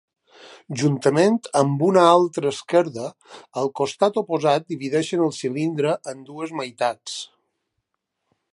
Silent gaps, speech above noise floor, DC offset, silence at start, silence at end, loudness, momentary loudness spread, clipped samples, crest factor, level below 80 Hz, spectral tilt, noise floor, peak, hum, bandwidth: none; 57 dB; under 0.1%; 0.45 s; 1.25 s; -21 LUFS; 16 LU; under 0.1%; 20 dB; -72 dBFS; -5.5 dB/octave; -78 dBFS; -2 dBFS; none; 11.5 kHz